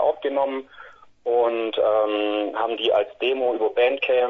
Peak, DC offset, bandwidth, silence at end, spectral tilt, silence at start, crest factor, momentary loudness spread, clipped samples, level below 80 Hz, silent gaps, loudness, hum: -8 dBFS; under 0.1%; 5.6 kHz; 0 s; -5.5 dB/octave; 0 s; 14 dB; 5 LU; under 0.1%; -66 dBFS; none; -22 LUFS; none